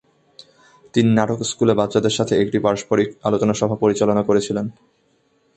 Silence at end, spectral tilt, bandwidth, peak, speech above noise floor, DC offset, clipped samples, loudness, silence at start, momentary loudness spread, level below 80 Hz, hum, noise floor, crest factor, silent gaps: 0.85 s; -5.5 dB/octave; 9 kHz; -2 dBFS; 44 dB; under 0.1%; under 0.1%; -19 LUFS; 0.95 s; 5 LU; -54 dBFS; none; -62 dBFS; 18 dB; none